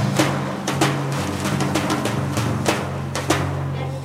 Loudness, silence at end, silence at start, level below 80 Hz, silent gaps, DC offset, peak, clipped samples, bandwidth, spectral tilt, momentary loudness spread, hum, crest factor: -22 LUFS; 0 s; 0 s; -50 dBFS; none; under 0.1%; -4 dBFS; under 0.1%; 16 kHz; -5 dB/octave; 5 LU; none; 18 dB